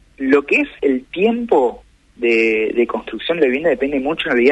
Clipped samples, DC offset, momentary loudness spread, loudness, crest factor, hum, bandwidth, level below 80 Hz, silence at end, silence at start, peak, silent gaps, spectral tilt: under 0.1%; under 0.1%; 7 LU; -17 LUFS; 16 dB; none; 8.6 kHz; -50 dBFS; 0 s; 0.2 s; -2 dBFS; none; -6 dB/octave